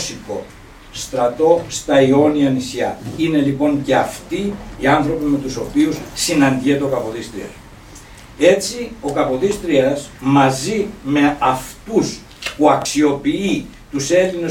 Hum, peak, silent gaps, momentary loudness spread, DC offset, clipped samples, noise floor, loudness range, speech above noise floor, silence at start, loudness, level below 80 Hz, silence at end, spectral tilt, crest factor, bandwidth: none; 0 dBFS; none; 11 LU; under 0.1%; under 0.1%; -39 dBFS; 3 LU; 22 dB; 0 s; -17 LUFS; -42 dBFS; 0 s; -5 dB/octave; 16 dB; 16.5 kHz